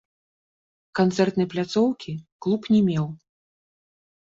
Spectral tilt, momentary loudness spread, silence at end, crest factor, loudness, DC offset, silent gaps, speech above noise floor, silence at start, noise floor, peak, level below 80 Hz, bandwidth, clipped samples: -7 dB/octave; 12 LU; 1.15 s; 18 dB; -24 LUFS; under 0.1%; 2.32-2.39 s; over 68 dB; 0.95 s; under -90 dBFS; -8 dBFS; -62 dBFS; 7.8 kHz; under 0.1%